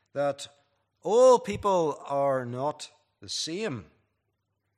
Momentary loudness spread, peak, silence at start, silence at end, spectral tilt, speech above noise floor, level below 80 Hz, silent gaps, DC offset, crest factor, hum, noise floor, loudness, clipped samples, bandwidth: 20 LU; -10 dBFS; 0.15 s; 0.95 s; -4.5 dB/octave; 53 dB; -64 dBFS; none; under 0.1%; 18 dB; none; -79 dBFS; -26 LUFS; under 0.1%; 11.5 kHz